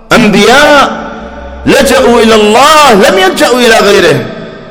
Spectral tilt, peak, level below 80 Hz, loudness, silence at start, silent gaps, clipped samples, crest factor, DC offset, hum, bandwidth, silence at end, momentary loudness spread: -3.5 dB/octave; 0 dBFS; -30 dBFS; -4 LUFS; 0.1 s; none; 20%; 4 dB; under 0.1%; none; over 20 kHz; 0 s; 17 LU